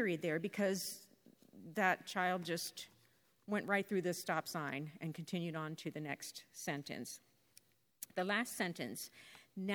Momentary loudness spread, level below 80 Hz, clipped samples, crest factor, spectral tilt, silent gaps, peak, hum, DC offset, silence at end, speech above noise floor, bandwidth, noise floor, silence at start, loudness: 15 LU; -88 dBFS; under 0.1%; 24 dB; -4 dB/octave; none; -18 dBFS; none; under 0.1%; 0 s; 33 dB; 19.5 kHz; -73 dBFS; 0 s; -40 LUFS